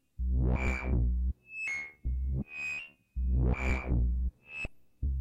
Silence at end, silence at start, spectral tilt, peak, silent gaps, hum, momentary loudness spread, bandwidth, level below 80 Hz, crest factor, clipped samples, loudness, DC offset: 0 s; 0.2 s; -7 dB/octave; -20 dBFS; none; none; 9 LU; 8.2 kHz; -32 dBFS; 12 dB; under 0.1%; -34 LUFS; under 0.1%